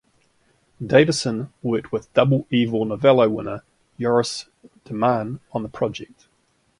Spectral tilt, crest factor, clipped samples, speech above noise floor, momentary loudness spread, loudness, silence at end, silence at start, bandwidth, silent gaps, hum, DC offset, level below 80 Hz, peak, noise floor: -6 dB/octave; 20 dB; under 0.1%; 44 dB; 16 LU; -21 LUFS; 0.75 s; 0.8 s; 11.5 kHz; none; none; under 0.1%; -56 dBFS; -2 dBFS; -65 dBFS